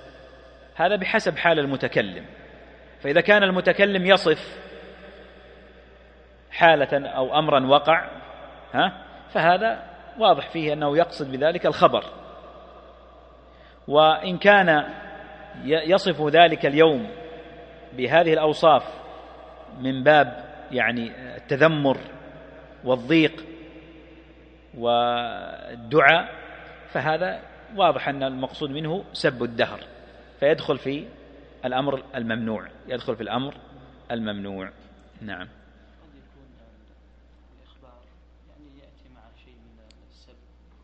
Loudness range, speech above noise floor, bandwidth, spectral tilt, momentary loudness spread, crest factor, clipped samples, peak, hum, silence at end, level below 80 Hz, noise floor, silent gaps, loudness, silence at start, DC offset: 9 LU; 32 dB; 9 kHz; -6 dB/octave; 23 LU; 24 dB; under 0.1%; 0 dBFS; none; 5.4 s; -54 dBFS; -53 dBFS; none; -21 LUFS; 0.05 s; under 0.1%